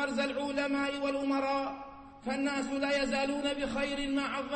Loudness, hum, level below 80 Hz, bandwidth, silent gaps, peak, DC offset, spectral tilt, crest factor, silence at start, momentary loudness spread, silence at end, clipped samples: -32 LUFS; none; -56 dBFS; 8.8 kHz; none; -20 dBFS; under 0.1%; -3.5 dB/octave; 12 dB; 0 s; 7 LU; 0 s; under 0.1%